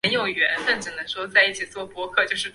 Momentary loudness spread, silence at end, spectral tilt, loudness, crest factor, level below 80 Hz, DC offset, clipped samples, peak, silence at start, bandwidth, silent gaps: 12 LU; 0.05 s; -2 dB/octave; -22 LUFS; 20 dB; -62 dBFS; under 0.1%; under 0.1%; -4 dBFS; 0.05 s; 11.5 kHz; none